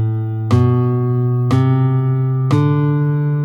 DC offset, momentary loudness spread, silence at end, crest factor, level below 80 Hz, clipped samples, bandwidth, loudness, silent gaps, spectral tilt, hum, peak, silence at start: under 0.1%; 3 LU; 0 s; 12 dB; -52 dBFS; under 0.1%; 6.6 kHz; -16 LUFS; none; -9.5 dB/octave; none; -2 dBFS; 0 s